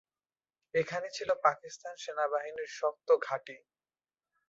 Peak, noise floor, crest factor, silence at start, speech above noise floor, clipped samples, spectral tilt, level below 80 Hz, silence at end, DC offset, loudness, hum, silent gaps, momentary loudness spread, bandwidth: -12 dBFS; under -90 dBFS; 22 dB; 0.75 s; over 57 dB; under 0.1%; -3.5 dB/octave; -80 dBFS; 0.9 s; under 0.1%; -33 LUFS; none; none; 13 LU; 8 kHz